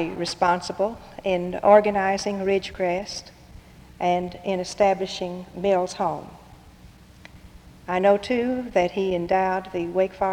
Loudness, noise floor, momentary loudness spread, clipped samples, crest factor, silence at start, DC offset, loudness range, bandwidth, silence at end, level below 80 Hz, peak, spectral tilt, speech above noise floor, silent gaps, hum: -23 LUFS; -48 dBFS; 9 LU; under 0.1%; 20 dB; 0 s; under 0.1%; 4 LU; 12.5 kHz; 0 s; -52 dBFS; -4 dBFS; -5 dB/octave; 25 dB; none; none